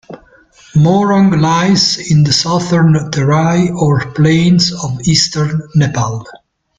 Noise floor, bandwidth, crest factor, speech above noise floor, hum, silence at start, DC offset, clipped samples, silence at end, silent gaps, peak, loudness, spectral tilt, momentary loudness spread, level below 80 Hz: -44 dBFS; 9.2 kHz; 12 dB; 33 dB; none; 0.1 s; under 0.1%; under 0.1%; 0.45 s; none; 0 dBFS; -12 LUFS; -5.5 dB/octave; 6 LU; -42 dBFS